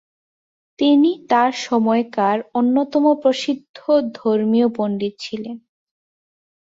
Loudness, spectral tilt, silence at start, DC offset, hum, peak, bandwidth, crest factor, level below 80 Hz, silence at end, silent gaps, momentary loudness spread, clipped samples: -18 LUFS; -5.5 dB/octave; 0.8 s; under 0.1%; none; -4 dBFS; 7.8 kHz; 16 dB; -66 dBFS; 1.1 s; 3.69-3.74 s; 11 LU; under 0.1%